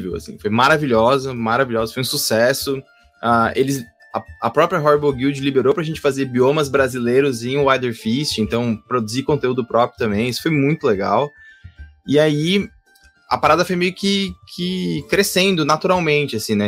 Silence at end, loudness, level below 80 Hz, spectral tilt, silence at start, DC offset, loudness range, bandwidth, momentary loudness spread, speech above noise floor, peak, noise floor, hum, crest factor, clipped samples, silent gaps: 0 s; -18 LUFS; -48 dBFS; -5 dB/octave; 0 s; under 0.1%; 2 LU; 16 kHz; 9 LU; 35 dB; -2 dBFS; -53 dBFS; none; 16 dB; under 0.1%; none